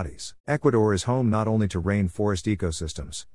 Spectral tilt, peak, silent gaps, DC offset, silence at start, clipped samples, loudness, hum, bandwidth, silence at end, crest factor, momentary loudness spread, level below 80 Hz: -6 dB/octave; -10 dBFS; 0.40-0.44 s; 0.3%; 0 s; under 0.1%; -25 LUFS; none; 12 kHz; 0.1 s; 16 dB; 11 LU; -46 dBFS